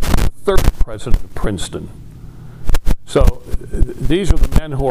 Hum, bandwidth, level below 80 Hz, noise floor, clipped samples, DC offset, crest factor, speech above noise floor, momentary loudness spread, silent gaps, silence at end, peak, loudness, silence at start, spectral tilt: none; 15.5 kHz; -16 dBFS; -33 dBFS; 0.4%; under 0.1%; 12 dB; 21 dB; 16 LU; none; 0 s; 0 dBFS; -20 LUFS; 0 s; -6 dB/octave